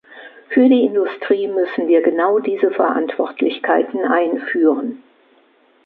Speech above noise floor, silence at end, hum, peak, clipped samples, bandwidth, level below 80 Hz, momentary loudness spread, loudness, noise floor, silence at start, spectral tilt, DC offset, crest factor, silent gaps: 38 dB; 0.9 s; none; -2 dBFS; under 0.1%; 4.5 kHz; -70 dBFS; 7 LU; -17 LUFS; -55 dBFS; 0.1 s; -8.5 dB/octave; under 0.1%; 16 dB; none